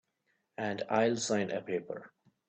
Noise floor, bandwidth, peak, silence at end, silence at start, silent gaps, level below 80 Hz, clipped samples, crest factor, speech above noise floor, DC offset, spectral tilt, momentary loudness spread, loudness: -79 dBFS; 8.8 kHz; -14 dBFS; 0.4 s; 0.6 s; none; -76 dBFS; under 0.1%; 20 dB; 46 dB; under 0.1%; -4.5 dB/octave; 15 LU; -33 LUFS